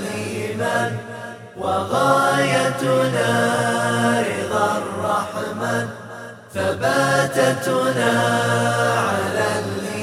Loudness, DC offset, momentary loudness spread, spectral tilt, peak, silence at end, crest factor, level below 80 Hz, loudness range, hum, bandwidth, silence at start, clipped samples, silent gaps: -20 LUFS; under 0.1%; 10 LU; -4.5 dB/octave; -2 dBFS; 0 s; 18 dB; -62 dBFS; 3 LU; none; 16 kHz; 0 s; under 0.1%; none